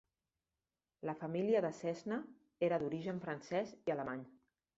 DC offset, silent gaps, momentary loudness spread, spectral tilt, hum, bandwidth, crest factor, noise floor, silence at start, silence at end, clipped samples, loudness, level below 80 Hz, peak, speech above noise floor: under 0.1%; none; 11 LU; -6 dB/octave; none; 8 kHz; 18 dB; under -90 dBFS; 1 s; 0.5 s; under 0.1%; -40 LUFS; -78 dBFS; -22 dBFS; over 51 dB